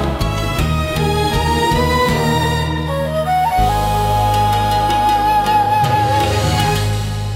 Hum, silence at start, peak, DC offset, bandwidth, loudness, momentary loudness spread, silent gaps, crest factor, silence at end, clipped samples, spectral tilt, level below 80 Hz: none; 0 s; -4 dBFS; under 0.1%; 16.5 kHz; -16 LUFS; 5 LU; none; 12 dB; 0 s; under 0.1%; -5 dB/octave; -26 dBFS